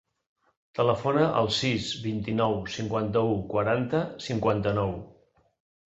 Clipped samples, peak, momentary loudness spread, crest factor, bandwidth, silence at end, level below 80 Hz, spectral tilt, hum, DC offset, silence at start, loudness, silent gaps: under 0.1%; -8 dBFS; 7 LU; 20 dB; 8.2 kHz; 0.8 s; -54 dBFS; -6 dB/octave; none; under 0.1%; 0.75 s; -27 LUFS; none